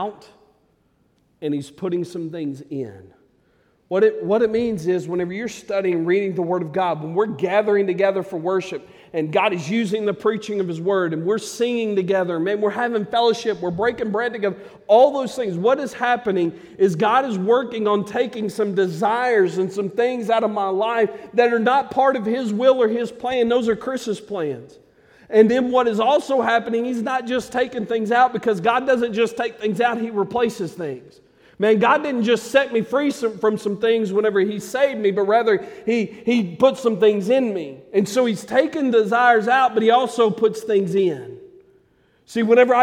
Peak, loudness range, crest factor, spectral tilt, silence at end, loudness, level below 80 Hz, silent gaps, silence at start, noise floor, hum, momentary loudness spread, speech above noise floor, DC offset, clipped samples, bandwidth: -2 dBFS; 4 LU; 18 dB; -5.5 dB/octave; 0 s; -20 LUFS; -62 dBFS; none; 0 s; -62 dBFS; none; 9 LU; 43 dB; under 0.1%; under 0.1%; 15 kHz